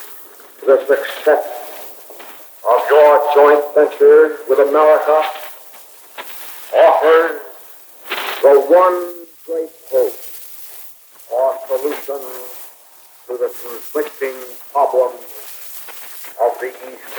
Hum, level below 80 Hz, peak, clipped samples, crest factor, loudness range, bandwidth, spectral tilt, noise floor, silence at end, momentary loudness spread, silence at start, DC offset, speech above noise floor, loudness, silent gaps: none; -84 dBFS; 0 dBFS; under 0.1%; 16 dB; 11 LU; over 20 kHz; -1.5 dB/octave; -44 dBFS; 0 s; 23 LU; 0 s; under 0.1%; 31 dB; -14 LUFS; none